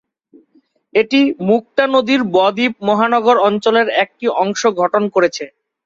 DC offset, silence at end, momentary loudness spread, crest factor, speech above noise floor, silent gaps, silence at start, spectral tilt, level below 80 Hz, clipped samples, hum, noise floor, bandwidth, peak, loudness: under 0.1%; 0.4 s; 5 LU; 14 dB; 42 dB; none; 0.95 s; -4.5 dB/octave; -62 dBFS; under 0.1%; none; -56 dBFS; 7.6 kHz; 0 dBFS; -15 LUFS